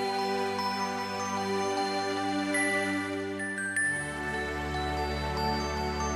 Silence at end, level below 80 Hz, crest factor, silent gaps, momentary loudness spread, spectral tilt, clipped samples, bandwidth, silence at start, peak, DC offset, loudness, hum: 0 s; -44 dBFS; 14 dB; none; 5 LU; -4 dB/octave; under 0.1%; 14 kHz; 0 s; -16 dBFS; under 0.1%; -30 LUFS; none